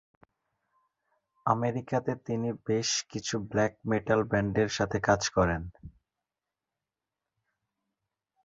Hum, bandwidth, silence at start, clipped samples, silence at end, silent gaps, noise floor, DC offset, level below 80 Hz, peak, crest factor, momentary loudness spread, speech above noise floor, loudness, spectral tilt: none; 8 kHz; 1.45 s; under 0.1%; 2.55 s; none; -89 dBFS; under 0.1%; -52 dBFS; -10 dBFS; 22 dB; 7 LU; 61 dB; -29 LUFS; -4.5 dB/octave